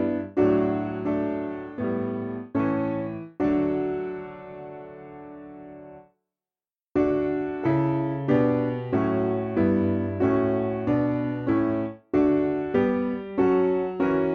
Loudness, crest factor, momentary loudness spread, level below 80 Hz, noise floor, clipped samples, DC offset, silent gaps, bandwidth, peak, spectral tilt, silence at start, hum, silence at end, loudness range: -25 LUFS; 16 dB; 17 LU; -54 dBFS; under -90 dBFS; under 0.1%; under 0.1%; none; 4.9 kHz; -10 dBFS; -10 dB/octave; 0 s; none; 0 s; 7 LU